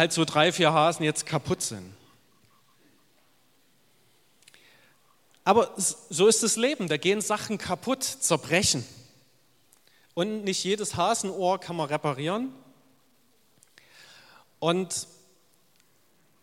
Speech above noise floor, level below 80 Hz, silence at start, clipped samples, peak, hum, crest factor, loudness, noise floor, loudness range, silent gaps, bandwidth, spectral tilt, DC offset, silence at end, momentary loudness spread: 40 dB; -64 dBFS; 0 s; under 0.1%; -4 dBFS; none; 24 dB; -26 LUFS; -66 dBFS; 10 LU; none; 16.5 kHz; -3 dB/octave; under 0.1%; 1.4 s; 10 LU